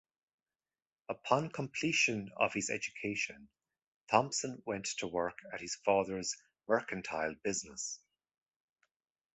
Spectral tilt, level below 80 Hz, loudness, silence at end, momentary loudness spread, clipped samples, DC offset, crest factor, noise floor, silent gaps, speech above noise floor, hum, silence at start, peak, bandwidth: -3 dB/octave; -70 dBFS; -35 LUFS; 1.4 s; 10 LU; under 0.1%; under 0.1%; 28 dB; under -90 dBFS; 3.87-4.05 s; over 54 dB; none; 1.1 s; -10 dBFS; 8.2 kHz